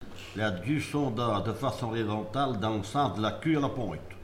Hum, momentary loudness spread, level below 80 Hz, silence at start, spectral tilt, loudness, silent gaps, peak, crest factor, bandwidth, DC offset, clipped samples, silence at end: none; 4 LU; -54 dBFS; 0 s; -6.5 dB/octave; -30 LUFS; none; -16 dBFS; 14 dB; 16 kHz; under 0.1%; under 0.1%; 0 s